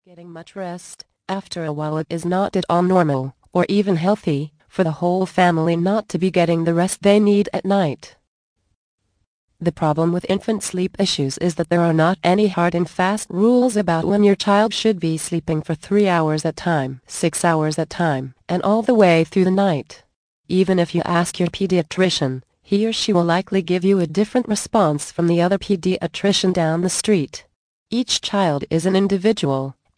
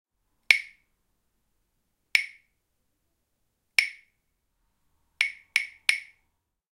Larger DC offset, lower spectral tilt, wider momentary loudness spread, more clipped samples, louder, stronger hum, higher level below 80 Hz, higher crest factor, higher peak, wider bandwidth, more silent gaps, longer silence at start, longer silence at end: neither; first, -5.5 dB/octave vs 2.5 dB/octave; about the same, 9 LU vs 11 LU; neither; first, -19 LUFS vs -25 LUFS; neither; first, -54 dBFS vs -72 dBFS; second, 16 dB vs 32 dB; about the same, -2 dBFS vs 0 dBFS; second, 10.5 kHz vs 16 kHz; first, 8.28-8.56 s, 8.75-8.98 s, 9.27-9.48 s, 20.16-20.44 s, 27.56-27.86 s vs none; second, 0.2 s vs 0.5 s; second, 0.25 s vs 0.75 s